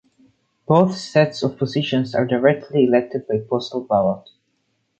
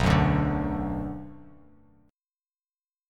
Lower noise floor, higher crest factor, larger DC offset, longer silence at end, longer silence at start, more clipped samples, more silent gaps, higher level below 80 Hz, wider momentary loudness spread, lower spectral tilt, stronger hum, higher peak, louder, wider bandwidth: second, -69 dBFS vs under -90 dBFS; about the same, 18 dB vs 20 dB; neither; second, 0.8 s vs 1.65 s; first, 0.7 s vs 0 s; neither; neither; second, -58 dBFS vs -38 dBFS; second, 7 LU vs 18 LU; about the same, -7 dB/octave vs -7.5 dB/octave; neither; first, -2 dBFS vs -10 dBFS; first, -19 LUFS vs -27 LUFS; second, 8.8 kHz vs 11 kHz